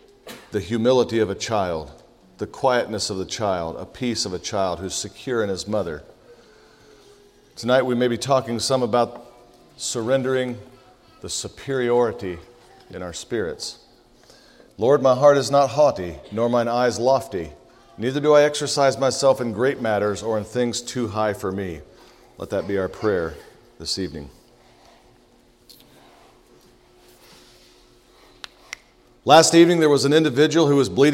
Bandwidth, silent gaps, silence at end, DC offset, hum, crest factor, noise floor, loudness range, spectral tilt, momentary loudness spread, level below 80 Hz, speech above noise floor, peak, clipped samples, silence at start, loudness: 16 kHz; none; 0 s; under 0.1%; none; 22 dB; -55 dBFS; 9 LU; -4.5 dB/octave; 18 LU; -54 dBFS; 35 dB; 0 dBFS; under 0.1%; 0.25 s; -21 LUFS